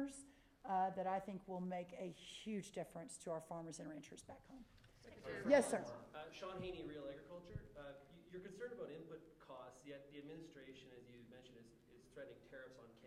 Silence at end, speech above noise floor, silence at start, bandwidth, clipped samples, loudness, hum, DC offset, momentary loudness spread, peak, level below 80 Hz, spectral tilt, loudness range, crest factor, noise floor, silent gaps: 0 s; 20 dB; 0 s; 15 kHz; under 0.1%; -47 LUFS; none; under 0.1%; 20 LU; -20 dBFS; -72 dBFS; -5 dB/octave; 15 LU; 28 dB; -67 dBFS; none